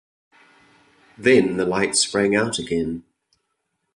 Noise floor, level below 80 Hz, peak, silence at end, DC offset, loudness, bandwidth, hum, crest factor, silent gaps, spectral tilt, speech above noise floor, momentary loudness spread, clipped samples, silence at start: -75 dBFS; -54 dBFS; -2 dBFS; 0.95 s; under 0.1%; -20 LUFS; 11.5 kHz; none; 20 dB; none; -3.5 dB/octave; 55 dB; 8 LU; under 0.1%; 1.2 s